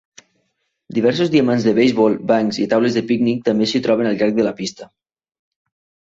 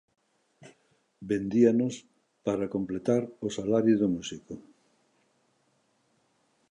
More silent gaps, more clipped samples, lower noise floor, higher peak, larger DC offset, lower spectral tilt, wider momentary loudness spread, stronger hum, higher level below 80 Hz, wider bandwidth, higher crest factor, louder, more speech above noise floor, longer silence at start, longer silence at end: neither; neither; about the same, -70 dBFS vs -71 dBFS; first, -2 dBFS vs -10 dBFS; neither; about the same, -6 dB/octave vs -6.5 dB/octave; second, 5 LU vs 20 LU; neither; first, -58 dBFS vs -66 dBFS; second, 7.8 kHz vs 10 kHz; second, 16 dB vs 22 dB; first, -17 LUFS vs -28 LUFS; first, 54 dB vs 44 dB; first, 0.9 s vs 0.6 s; second, 1.3 s vs 2.1 s